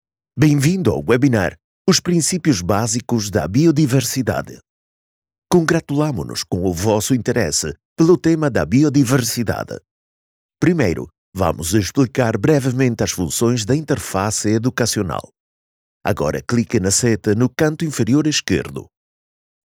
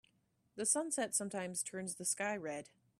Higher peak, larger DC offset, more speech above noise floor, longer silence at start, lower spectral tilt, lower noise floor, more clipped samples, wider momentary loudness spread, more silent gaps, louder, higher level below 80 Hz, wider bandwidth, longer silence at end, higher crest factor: first, -2 dBFS vs -18 dBFS; neither; first, over 73 dB vs 38 dB; second, 0.35 s vs 0.55 s; first, -5 dB/octave vs -2.5 dB/octave; first, under -90 dBFS vs -77 dBFS; neither; about the same, 8 LU vs 10 LU; first, 1.64-1.85 s, 4.69-5.22 s, 5.38-5.42 s, 7.85-7.96 s, 9.91-10.49 s, 11.18-11.32 s, 15.40-16.01 s vs none; first, -18 LUFS vs -37 LUFS; first, -44 dBFS vs -82 dBFS; first, 18.5 kHz vs 15 kHz; first, 0.8 s vs 0.35 s; second, 14 dB vs 22 dB